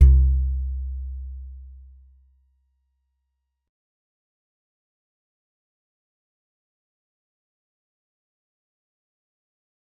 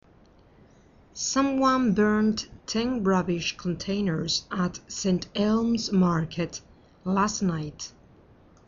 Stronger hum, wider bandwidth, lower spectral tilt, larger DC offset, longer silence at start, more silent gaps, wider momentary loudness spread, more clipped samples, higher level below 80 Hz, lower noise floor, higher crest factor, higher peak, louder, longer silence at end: neither; second, 1 kHz vs 7.6 kHz; first, -12 dB/octave vs -5 dB/octave; neither; second, 0 s vs 1.15 s; neither; first, 24 LU vs 11 LU; neither; first, -28 dBFS vs -52 dBFS; first, -78 dBFS vs -56 dBFS; first, 24 dB vs 16 dB; first, -2 dBFS vs -10 dBFS; about the same, -24 LUFS vs -26 LUFS; first, 8.3 s vs 0.8 s